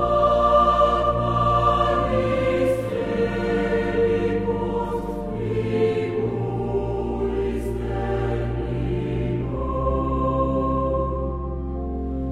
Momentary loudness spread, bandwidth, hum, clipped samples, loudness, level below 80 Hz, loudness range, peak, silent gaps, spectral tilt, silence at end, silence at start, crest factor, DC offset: 9 LU; 12 kHz; none; under 0.1%; -23 LUFS; -32 dBFS; 5 LU; -6 dBFS; none; -8 dB/octave; 0 s; 0 s; 16 dB; 0.1%